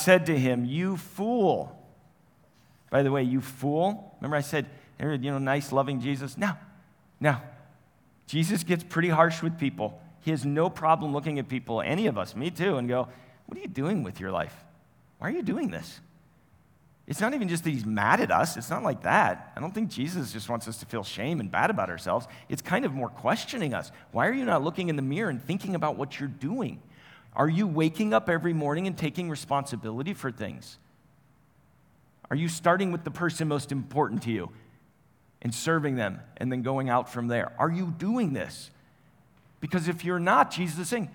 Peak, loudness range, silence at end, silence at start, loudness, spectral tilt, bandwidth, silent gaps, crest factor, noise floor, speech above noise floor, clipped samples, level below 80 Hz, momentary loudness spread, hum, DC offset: -6 dBFS; 5 LU; 0 s; 0 s; -28 LUFS; -6 dB/octave; over 20 kHz; none; 24 dB; -63 dBFS; 35 dB; under 0.1%; -68 dBFS; 11 LU; none; under 0.1%